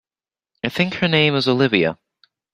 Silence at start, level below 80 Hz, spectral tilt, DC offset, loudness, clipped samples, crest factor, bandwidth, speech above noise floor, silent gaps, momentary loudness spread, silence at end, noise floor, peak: 0.65 s; -56 dBFS; -6.5 dB/octave; under 0.1%; -18 LUFS; under 0.1%; 20 dB; 15 kHz; over 72 dB; none; 11 LU; 0.6 s; under -90 dBFS; -2 dBFS